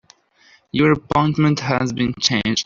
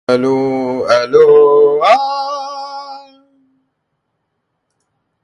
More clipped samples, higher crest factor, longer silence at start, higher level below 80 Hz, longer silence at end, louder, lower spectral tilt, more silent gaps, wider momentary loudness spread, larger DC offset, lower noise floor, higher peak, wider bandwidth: neither; about the same, 16 dB vs 14 dB; first, 0.75 s vs 0.1 s; first, -48 dBFS vs -60 dBFS; second, 0 s vs 2.2 s; second, -18 LUFS vs -11 LUFS; about the same, -5 dB/octave vs -5.5 dB/octave; neither; second, 5 LU vs 19 LU; neither; second, -54 dBFS vs -70 dBFS; about the same, -2 dBFS vs 0 dBFS; second, 7.6 kHz vs 9.2 kHz